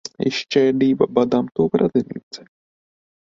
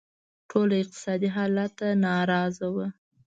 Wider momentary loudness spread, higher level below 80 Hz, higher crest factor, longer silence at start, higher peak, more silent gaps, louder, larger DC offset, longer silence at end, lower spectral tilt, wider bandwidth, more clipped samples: first, 16 LU vs 6 LU; first, -56 dBFS vs -66 dBFS; about the same, 18 dB vs 18 dB; second, 0.2 s vs 0.5 s; first, -2 dBFS vs -10 dBFS; first, 2.23-2.31 s vs none; first, -19 LUFS vs -27 LUFS; neither; first, 0.95 s vs 0.35 s; about the same, -6 dB/octave vs -6.5 dB/octave; about the same, 7.8 kHz vs 7.8 kHz; neither